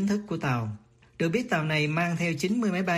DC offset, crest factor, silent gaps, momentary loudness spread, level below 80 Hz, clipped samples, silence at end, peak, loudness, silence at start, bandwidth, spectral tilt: under 0.1%; 16 dB; none; 6 LU; -62 dBFS; under 0.1%; 0 s; -12 dBFS; -27 LUFS; 0 s; 15.5 kHz; -6 dB/octave